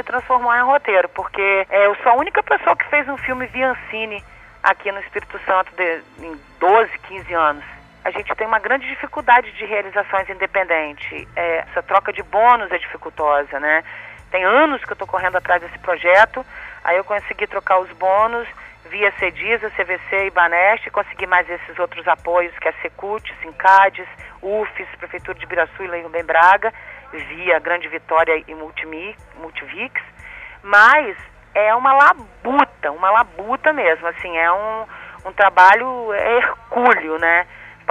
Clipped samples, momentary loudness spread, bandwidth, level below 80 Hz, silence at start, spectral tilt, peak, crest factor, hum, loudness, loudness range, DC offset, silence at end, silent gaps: under 0.1%; 17 LU; 10 kHz; -50 dBFS; 0.05 s; -4.5 dB/octave; 0 dBFS; 18 dB; none; -17 LUFS; 5 LU; under 0.1%; 0.2 s; none